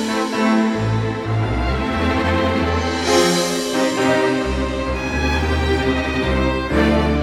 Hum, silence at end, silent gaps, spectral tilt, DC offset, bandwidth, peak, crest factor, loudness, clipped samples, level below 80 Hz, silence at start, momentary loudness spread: none; 0 s; none; -5 dB/octave; under 0.1%; 15 kHz; -4 dBFS; 14 dB; -18 LUFS; under 0.1%; -28 dBFS; 0 s; 5 LU